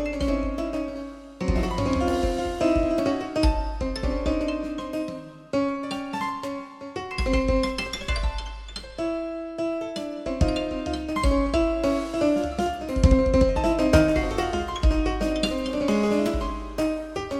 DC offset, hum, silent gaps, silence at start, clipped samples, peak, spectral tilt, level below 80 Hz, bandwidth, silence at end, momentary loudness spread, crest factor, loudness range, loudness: under 0.1%; none; none; 0 s; under 0.1%; -6 dBFS; -6.5 dB/octave; -30 dBFS; 13.5 kHz; 0 s; 11 LU; 18 dB; 6 LU; -25 LUFS